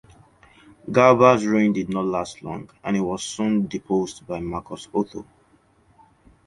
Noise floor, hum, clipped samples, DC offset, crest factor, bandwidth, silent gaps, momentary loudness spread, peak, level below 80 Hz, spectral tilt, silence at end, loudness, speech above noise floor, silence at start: -59 dBFS; none; under 0.1%; under 0.1%; 22 dB; 11.5 kHz; none; 17 LU; -2 dBFS; -54 dBFS; -6 dB/octave; 1.25 s; -22 LUFS; 38 dB; 0.85 s